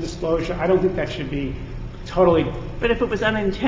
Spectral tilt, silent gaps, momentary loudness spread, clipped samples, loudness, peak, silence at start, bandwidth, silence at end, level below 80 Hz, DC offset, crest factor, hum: -7 dB/octave; none; 12 LU; under 0.1%; -21 LUFS; -4 dBFS; 0 s; 7.8 kHz; 0 s; -34 dBFS; under 0.1%; 16 dB; none